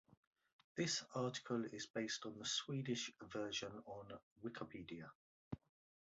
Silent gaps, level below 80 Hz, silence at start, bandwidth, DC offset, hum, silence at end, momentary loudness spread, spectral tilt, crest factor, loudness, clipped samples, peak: 1.90-1.94 s, 4.23-4.36 s, 5.15-5.51 s; -76 dBFS; 0.75 s; 8 kHz; under 0.1%; none; 0.45 s; 13 LU; -3.5 dB/octave; 20 dB; -46 LUFS; under 0.1%; -28 dBFS